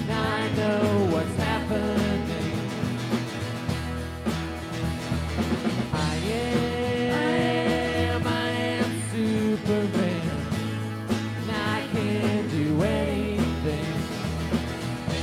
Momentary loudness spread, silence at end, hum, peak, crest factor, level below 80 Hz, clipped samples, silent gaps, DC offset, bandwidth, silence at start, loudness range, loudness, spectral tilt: 6 LU; 0 s; none; -12 dBFS; 14 dB; -42 dBFS; under 0.1%; none; under 0.1%; 16 kHz; 0 s; 4 LU; -26 LUFS; -6 dB/octave